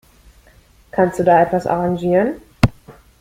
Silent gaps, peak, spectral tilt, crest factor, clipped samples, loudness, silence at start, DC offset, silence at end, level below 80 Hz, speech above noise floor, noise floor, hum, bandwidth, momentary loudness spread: none; 0 dBFS; -7.5 dB/octave; 18 dB; under 0.1%; -17 LUFS; 0.95 s; under 0.1%; 0.3 s; -36 dBFS; 34 dB; -50 dBFS; none; 16 kHz; 6 LU